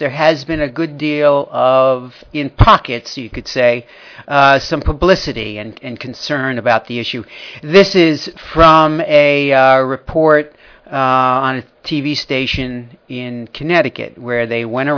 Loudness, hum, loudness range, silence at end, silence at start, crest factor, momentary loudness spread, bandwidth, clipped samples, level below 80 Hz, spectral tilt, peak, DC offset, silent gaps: -13 LUFS; none; 6 LU; 0 s; 0 s; 14 dB; 15 LU; 5.4 kHz; 0.3%; -32 dBFS; -6 dB/octave; 0 dBFS; under 0.1%; none